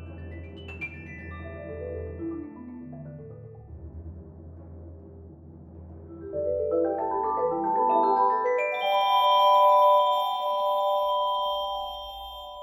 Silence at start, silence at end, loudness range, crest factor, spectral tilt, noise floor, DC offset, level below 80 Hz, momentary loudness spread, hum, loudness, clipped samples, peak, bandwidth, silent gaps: 0 s; 0 s; 21 LU; 16 dB; -6 dB/octave; -46 dBFS; under 0.1%; -52 dBFS; 25 LU; none; -24 LUFS; under 0.1%; -10 dBFS; 16 kHz; none